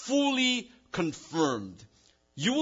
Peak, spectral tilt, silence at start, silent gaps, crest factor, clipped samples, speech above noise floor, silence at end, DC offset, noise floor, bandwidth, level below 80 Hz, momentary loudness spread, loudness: -14 dBFS; -3.5 dB/octave; 0 s; none; 18 dB; under 0.1%; 24 dB; 0 s; under 0.1%; -53 dBFS; 7.8 kHz; -68 dBFS; 12 LU; -29 LUFS